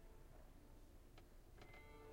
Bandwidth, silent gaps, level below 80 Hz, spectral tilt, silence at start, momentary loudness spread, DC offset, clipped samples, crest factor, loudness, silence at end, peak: 16 kHz; none; -64 dBFS; -5 dB/octave; 0 s; 5 LU; under 0.1%; under 0.1%; 12 dB; -65 LUFS; 0 s; -48 dBFS